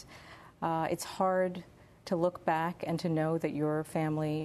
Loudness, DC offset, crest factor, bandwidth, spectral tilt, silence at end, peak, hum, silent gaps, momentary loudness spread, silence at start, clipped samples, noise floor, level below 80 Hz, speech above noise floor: -32 LUFS; under 0.1%; 18 dB; 13.5 kHz; -6.5 dB/octave; 0 s; -16 dBFS; none; none; 16 LU; 0 s; under 0.1%; -53 dBFS; -66 dBFS; 21 dB